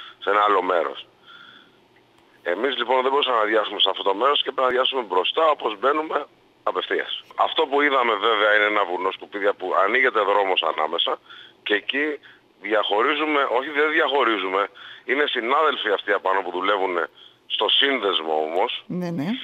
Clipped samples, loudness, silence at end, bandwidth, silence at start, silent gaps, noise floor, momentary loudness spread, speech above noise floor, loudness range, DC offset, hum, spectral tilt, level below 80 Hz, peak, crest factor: under 0.1%; -21 LUFS; 0 s; 8 kHz; 0 s; none; -56 dBFS; 9 LU; 35 dB; 3 LU; under 0.1%; none; -5 dB/octave; -76 dBFS; -4 dBFS; 18 dB